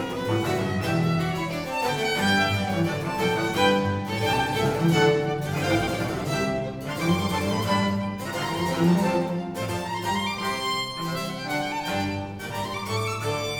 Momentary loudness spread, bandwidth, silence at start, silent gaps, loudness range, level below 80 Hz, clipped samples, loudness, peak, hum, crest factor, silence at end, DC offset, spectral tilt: 8 LU; over 20 kHz; 0 s; none; 4 LU; -50 dBFS; under 0.1%; -25 LUFS; -8 dBFS; none; 16 dB; 0 s; under 0.1%; -5 dB/octave